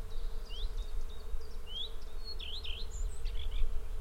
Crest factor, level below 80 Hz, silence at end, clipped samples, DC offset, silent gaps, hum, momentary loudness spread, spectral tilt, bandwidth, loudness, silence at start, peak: 16 dB; -36 dBFS; 0 s; under 0.1%; under 0.1%; none; none; 6 LU; -3.5 dB/octave; 8.8 kHz; -43 LUFS; 0 s; -18 dBFS